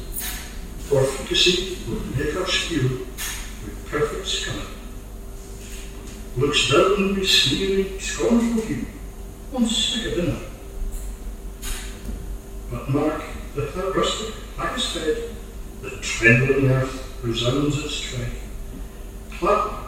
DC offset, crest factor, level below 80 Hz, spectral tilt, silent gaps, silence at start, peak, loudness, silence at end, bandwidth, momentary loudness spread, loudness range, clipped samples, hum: under 0.1%; 22 dB; -34 dBFS; -4 dB/octave; none; 0 s; 0 dBFS; -22 LUFS; 0 s; 16 kHz; 20 LU; 9 LU; under 0.1%; none